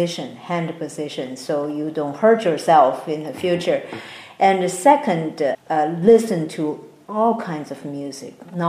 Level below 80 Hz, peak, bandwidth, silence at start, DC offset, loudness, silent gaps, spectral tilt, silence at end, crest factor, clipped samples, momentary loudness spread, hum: -66 dBFS; -2 dBFS; 15.5 kHz; 0 s; under 0.1%; -20 LUFS; none; -5.5 dB/octave; 0 s; 18 dB; under 0.1%; 16 LU; none